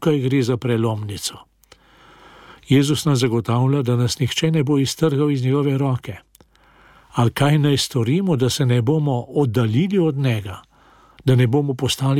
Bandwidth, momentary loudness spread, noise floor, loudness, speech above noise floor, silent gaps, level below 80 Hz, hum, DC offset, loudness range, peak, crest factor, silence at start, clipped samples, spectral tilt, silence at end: 16 kHz; 8 LU; -53 dBFS; -19 LUFS; 35 dB; none; -52 dBFS; none; under 0.1%; 3 LU; -6 dBFS; 14 dB; 0 s; under 0.1%; -6 dB/octave; 0 s